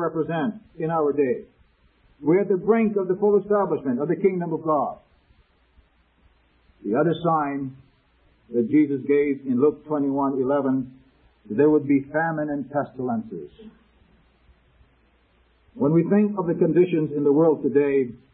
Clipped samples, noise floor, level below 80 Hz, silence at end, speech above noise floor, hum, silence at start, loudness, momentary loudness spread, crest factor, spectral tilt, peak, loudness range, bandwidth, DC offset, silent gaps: under 0.1%; -61 dBFS; -62 dBFS; 0.2 s; 39 dB; none; 0 s; -22 LUFS; 10 LU; 16 dB; -12.5 dB/octave; -6 dBFS; 6 LU; 3.9 kHz; under 0.1%; none